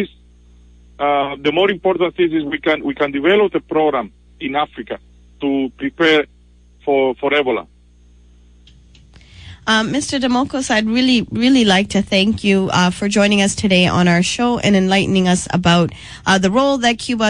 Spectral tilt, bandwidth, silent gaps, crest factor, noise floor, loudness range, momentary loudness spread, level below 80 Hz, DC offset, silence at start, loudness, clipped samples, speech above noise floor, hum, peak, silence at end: -4.5 dB/octave; 10.5 kHz; none; 16 dB; -48 dBFS; 6 LU; 10 LU; -44 dBFS; under 0.1%; 0 s; -16 LUFS; under 0.1%; 32 dB; 60 Hz at -40 dBFS; -2 dBFS; 0 s